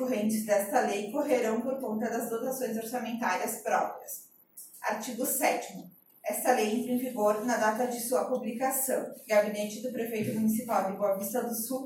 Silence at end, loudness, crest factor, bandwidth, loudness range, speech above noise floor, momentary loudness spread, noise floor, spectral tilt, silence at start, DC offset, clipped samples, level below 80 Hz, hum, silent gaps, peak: 0 s; -30 LUFS; 18 dB; 17 kHz; 3 LU; 22 dB; 8 LU; -52 dBFS; -4 dB/octave; 0 s; under 0.1%; under 0.1%; -80 dBFS; none; none; -12 dBFS